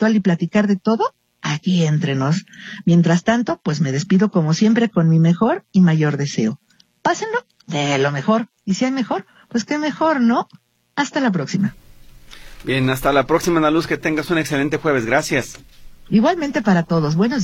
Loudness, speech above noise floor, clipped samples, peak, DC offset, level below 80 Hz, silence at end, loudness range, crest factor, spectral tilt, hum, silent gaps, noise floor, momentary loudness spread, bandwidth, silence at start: -18 LUFS; 24 dB; under 0.1%; -2 dBFS; under 0.1%; -48 dBFS; 0 s; 4 LU; 16 dB; -6 dB/octave; none; none; -41 dBFS; 9 LU; 16 kHz; 0 s